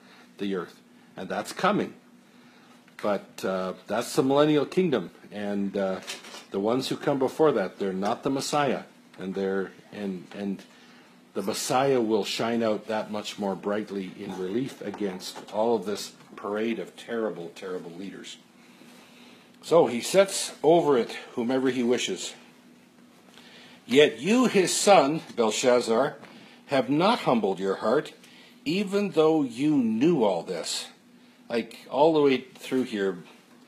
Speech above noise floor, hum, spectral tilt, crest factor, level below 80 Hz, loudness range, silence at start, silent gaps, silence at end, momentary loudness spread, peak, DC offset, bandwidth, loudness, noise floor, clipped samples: 29 dB; none; -4.5 dB/octave; 22 dB; -78 dBFS; 8 LU; 0.4 s; none; 0.45 s; 15 LU; -6 dBFS; under 0.1%; 15 kHz; -26 LUFS; -55 dBFS; under 0.1%